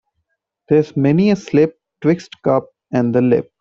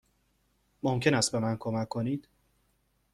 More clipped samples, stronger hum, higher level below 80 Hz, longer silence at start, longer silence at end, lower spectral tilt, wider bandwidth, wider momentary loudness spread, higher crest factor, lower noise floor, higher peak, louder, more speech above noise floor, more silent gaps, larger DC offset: neither; neither; first, -56 dBFS vs -64 dBFS; second, 0.7 s vs 0.85 s; second, 0.2 s vs 0.95 s; first, -8.5 dB/octave vs -4.5 dB/octave; second, 7.4 kHz vs 14.5 kHz; second, 5 LU vs 9 LU; second, 16 dB vs 22 dB; about the same, -72 dBFS vs -72 dBFS; first, -2 dBFS vs -10 dBFS; first, -17 LUFS vs -30 LUFS; first, 57 dB vs 43 dB; neither; neither